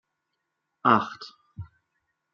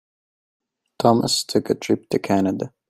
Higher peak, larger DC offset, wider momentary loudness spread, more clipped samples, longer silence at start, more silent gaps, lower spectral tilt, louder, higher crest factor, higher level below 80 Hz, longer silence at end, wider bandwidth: about the same, -4 dBFS vs -2 dBFS; neither; first, 23 LU vs 5 LU; neither; second, 0.85 s vs 1 s; neither; about the same, -4 dB/octave vs -5 dB/octave; second, -24 LUFS vs -21 LUFS; first, 26 dB vs 20 dB; second, -66 dBFS vs -60 dBFS; first, 0.7 s vs 0.2 s; second, 7.2 kHz vs 15.5 kHz